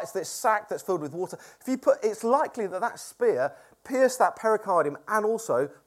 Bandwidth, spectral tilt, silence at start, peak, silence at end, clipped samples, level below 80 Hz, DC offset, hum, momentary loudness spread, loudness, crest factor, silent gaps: 15.5 kHz; -4 dB/octave; 0 s; -8 dBFS; 0.15 s; under 0.1%; -78 dBFS; under 0.1%; none; 8 LU; -27 LUFS; 18 dB; none